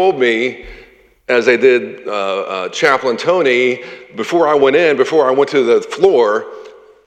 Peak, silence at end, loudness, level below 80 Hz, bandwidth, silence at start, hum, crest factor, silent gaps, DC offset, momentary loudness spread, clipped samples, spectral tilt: 0 dBFS; 0.35 s; -13 LUFS; -52 dBFS; 9 kHz; 0 s; none; 14 dB; none; under 0.1%; 11 LU; under 0.1%; -4.5 dB/octave